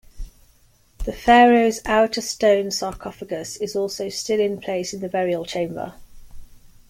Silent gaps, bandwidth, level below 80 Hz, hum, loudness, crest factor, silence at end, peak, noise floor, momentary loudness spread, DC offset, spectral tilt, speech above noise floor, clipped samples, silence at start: none; 16.5 kHz; -42 dBFS; none; -20 LUFS; 18 dB; 0.45 s; -4 dBFS; -56 dBFS; 16 LU; under 0.1%; -4 dB/octave; 36 dB; under 0.1%; 0.15 s